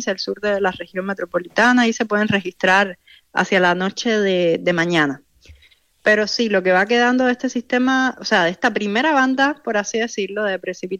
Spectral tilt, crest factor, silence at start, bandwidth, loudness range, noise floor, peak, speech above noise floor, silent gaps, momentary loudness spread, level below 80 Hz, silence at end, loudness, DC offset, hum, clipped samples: -4.5 dB/octave; 14 dB; 0 s; 9.8 kHz; 1 LU; -54 dBFS; -4 dBFS; 36 dB; none; 8 LU; -60 dBFS; 0 s; -18 LUFS; under 0.1%; none; under 0.1%